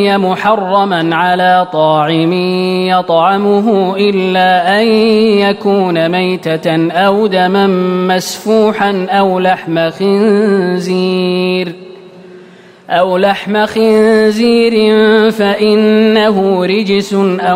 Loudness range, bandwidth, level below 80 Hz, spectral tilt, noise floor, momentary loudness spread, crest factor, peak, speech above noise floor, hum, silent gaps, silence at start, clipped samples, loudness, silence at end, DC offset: 4 LU; 16 kHz; -54 dBFS; -6 dB/octave; -37 dBFS; 5 LU; 10 dB; 0 dBFS; 27 dB; none; none; 0 s; under 0.1%; -10 LUFS; 0 s; under 0.1%